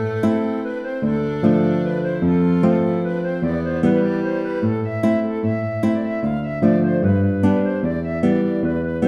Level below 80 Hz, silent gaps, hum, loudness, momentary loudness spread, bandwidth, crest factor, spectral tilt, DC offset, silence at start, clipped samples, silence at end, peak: -46 dBFS; none; none; -20 LUFS; 5 LU; 7.2 kHz; 16 dB; -9.5 dB/octave; under 0.1%; 0 s; under 0.1%; 0 s; -4 dBFS